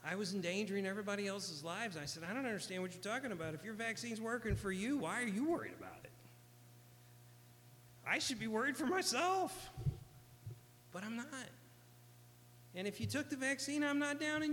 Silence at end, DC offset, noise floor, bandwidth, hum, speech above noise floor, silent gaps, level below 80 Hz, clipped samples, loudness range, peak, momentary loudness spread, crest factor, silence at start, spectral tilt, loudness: 0 s; under 0.1%; -62 dBFS; 19 kHz; 60 Hz at -65 dBFS; 22 dB; none; -62 dBFS; under 0.1%; 6 LU; -22 dBFS; 17 LU; 20 dB; 0 s; -4 dB/octave; -40 LUFS